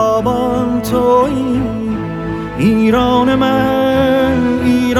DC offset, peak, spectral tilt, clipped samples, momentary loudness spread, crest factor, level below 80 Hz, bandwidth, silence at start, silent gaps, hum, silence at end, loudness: under 0.1%; 0 dBFS; -6.5 dB/octave; under 0.1%; 8 LU; 12 dB; -34 dBFS; 16 kHz; 0 s; none; none; 0 s; -14 LUFS